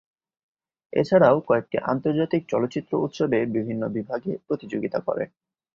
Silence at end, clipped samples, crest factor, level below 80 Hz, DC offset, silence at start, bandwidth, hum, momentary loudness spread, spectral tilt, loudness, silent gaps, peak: 0.5 s; under 0.1%; 20 dB; -64 dBFS; under 0.1%; 0.95 s; 7.4 kHz; none; 11 LU; -8 dB/octave; -24 LUFS; none; -4 dBFS